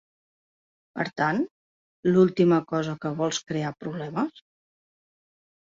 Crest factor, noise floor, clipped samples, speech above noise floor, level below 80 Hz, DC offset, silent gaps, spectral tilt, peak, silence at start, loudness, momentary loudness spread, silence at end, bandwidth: 20 dB; under -90 dBFS; under 0.1%; over 66 dB; -68 dBFS; under 0.1%; 1.51-2.03 s; -6 dB/octave; -8 dBFS; 0.95 s; -26 LUFS; 12 LU; 1.3 s; 7.6 kHz